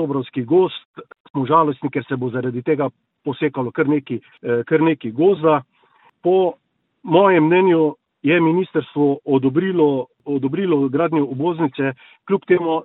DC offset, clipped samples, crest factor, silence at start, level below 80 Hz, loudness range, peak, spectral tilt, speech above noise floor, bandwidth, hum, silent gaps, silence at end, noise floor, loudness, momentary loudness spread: under 0.1%; under 0.1%; 18 dB; 0 s; -66 dBFS; 4 LU; -2 dBFS; -11.5 dB/octave; 38 dB; 4.1 kHz; none; 0.85-0.94 s, 1.20-1.34 s; 0 s; -56 dBFS; -19 LUFS; 10 LU